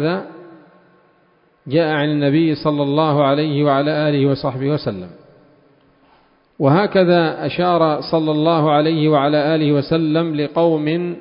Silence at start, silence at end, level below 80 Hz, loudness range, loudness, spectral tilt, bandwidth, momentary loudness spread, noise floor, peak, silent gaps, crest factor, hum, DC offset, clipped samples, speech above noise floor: 0 s; 0 s; -56 dBFS; 4 LU; -17 LUFS; -12 dB/octave; 5.4 kHz; 6 LU; -56 dBFS; -2 dBFS; none; 16 dB; none; under 0.1%; under 0.1%; 40 dB